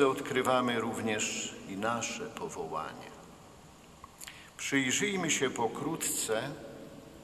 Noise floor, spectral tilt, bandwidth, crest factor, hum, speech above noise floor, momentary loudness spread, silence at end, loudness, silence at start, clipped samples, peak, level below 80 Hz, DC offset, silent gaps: -54 dBFS; -3 dB/octave; 14 kHz; 20 dB; none; 22 dB; 20 LU; 0 s; -32 LUFS; 0 s; under 0.1%; -12 dBFS; -66 dBFS; under 0.1%; none